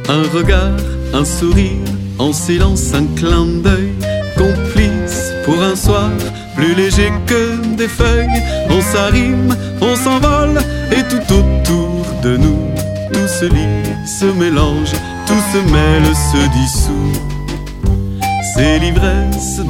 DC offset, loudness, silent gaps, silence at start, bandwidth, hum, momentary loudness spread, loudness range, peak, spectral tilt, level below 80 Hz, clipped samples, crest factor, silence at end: under 0.1%; -14 LUFS; none; 0 s; 17 kHz; none; 6 LU; 2 LU; 0 dBFS; -5.5 dB/octave; -18 dBFS; under 0.1%; 12 dB; 0 s